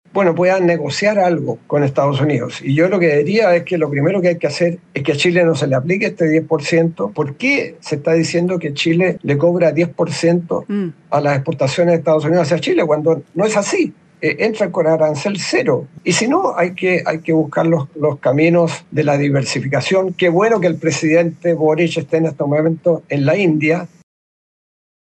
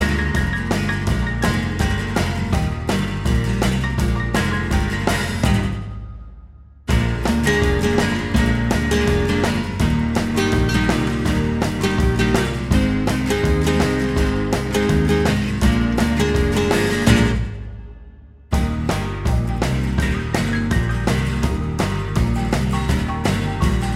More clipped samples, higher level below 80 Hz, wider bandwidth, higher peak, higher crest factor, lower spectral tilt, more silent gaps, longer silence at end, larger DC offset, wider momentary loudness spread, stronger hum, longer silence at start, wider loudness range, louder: neither; second, -62 dBFS vs -26 dBFS; second, 9.4 kHz vs 15.5 kHz; second, -4 dBFS vs 0 dBFS; second, 12 dB vs 18 dB; about the same, -6 dB/octave vs -6 dB/octave; neither; first, 1.3 s vs 0 s; neither; about the same, 5 LU vs 4 LU; neither; first, 0.15 s vs 0 s; about the same, 1 LU vs 3 LU; first, -16 LUFS vs -19 LUFS